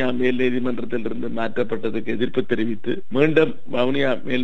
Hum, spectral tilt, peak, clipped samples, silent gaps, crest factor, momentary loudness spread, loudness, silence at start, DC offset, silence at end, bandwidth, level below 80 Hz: none; -7.5 dB/octave; -4 dBFS; under 0.1%; none; 18 dB; 8 LU; -23 LUFS; 0 s; 7%; 0 s; 8 kHz; -60 dBFS